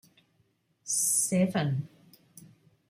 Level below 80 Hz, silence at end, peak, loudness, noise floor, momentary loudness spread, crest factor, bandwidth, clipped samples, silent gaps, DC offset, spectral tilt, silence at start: -72 dBFS; 0.45 s; -16 dBFS; -27 LUFS; -71 dBFS; 18 LU; 16 dB; 16 kHz; under 0.1%; none; under 0.1%; -4 dB/octave; 0.85 s